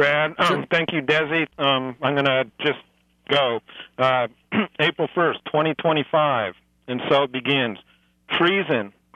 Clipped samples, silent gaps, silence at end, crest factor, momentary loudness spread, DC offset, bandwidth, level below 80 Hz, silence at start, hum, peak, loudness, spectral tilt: under 0.1%; none; 0.25 s; 16 dB; 7 LU; under 0.1%; 14 kHz; -66 dBFS; 0 s; none; -6 dBFS; -21 LUFS; -6 dB/octave